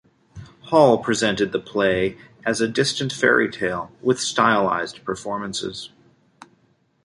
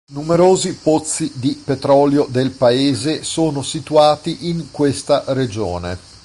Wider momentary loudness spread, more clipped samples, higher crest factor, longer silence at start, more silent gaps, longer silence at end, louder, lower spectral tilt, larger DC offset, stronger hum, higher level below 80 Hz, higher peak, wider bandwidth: about the same, 12 LU vs 10 LU; neither; first, 20 dB vs 14 dB; first, 0.35 s vs 0.1 s; neither; first, 1.2 s vs 0.25 s; second, -21 LUFS vs -17 LUFS; about the same, -4 dB/octave vs -5 dB/octave; neither; neither; second, -56 dBFS vs -44 dBFS; about the same, -2 dBFS vs -2 dBFS; about the same, 11.5 kHz vs 11.5 kHz